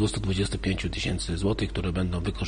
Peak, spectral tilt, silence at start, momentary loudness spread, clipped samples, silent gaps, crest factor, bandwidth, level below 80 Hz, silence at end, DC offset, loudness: -14 dBFS; -5.5 dB/octave; 0 s; 2 LU; under 0.1%; none; 14 dB; 10 kHz; -36 dBFS; 0 s; under 0.1%; -28 LUFS